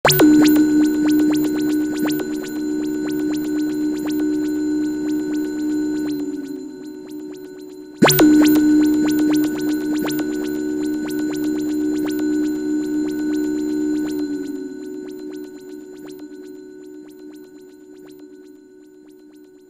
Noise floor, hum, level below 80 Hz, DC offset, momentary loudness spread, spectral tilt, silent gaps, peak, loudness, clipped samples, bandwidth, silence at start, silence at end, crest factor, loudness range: -45 dBFS; none; -52 dBFS; under 0.1%; 23 LU; -4.5 dB/octave; none; -2 dBFS; -19 LUFS; under 0.1%; 16 kHz; 0.05 s; 0.25 s; 18 dB; 19 LU